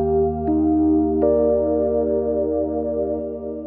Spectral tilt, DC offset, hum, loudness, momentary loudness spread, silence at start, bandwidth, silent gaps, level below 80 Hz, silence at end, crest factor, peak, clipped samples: -13 dB/octave; under 0.1%; none; -20 LUFS; 6 LU; 0 s; 2 kHz; none; -40 dBFS; 0 s; 12 dB; -8 dBFS; under 0.1%